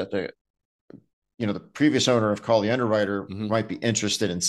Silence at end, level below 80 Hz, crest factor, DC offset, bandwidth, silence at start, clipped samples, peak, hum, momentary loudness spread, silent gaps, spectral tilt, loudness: 0 s; -64 dBFS; 18 dB; under 0.1%; 12.5 kHz; 0 s; under 0.1%; -8 dBFS; none; 9 LU; 0.41-0.54 s, 0.65-0.88 s, 1.13-1.22 s; -4 dB/octave; -24 LUFS